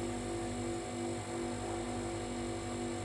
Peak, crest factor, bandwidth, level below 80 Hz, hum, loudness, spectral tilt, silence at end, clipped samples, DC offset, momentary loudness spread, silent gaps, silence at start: -26 dBFS; 12 dB; 11.5 kHz; -54 dBFS; none; -39 LUFS; -5 dB/octave; 0 s; under 0.1%; under 0.1%; 1 LU; none; 0 s